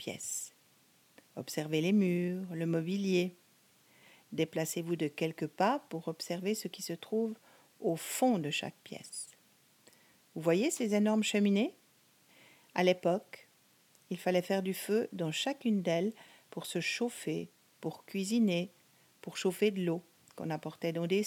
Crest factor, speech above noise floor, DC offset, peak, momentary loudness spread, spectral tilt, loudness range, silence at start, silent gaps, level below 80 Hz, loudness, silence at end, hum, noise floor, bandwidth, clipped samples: 22 dB; 34 dB; under 0.1%; -14 dBFS; 14 LU; -5 dB/octave; 3 LU; 0 s; none; -86 dBFS; -34 LUFS; 0 s; none; -67 dBFS; 17.5 kHz; under 0.1%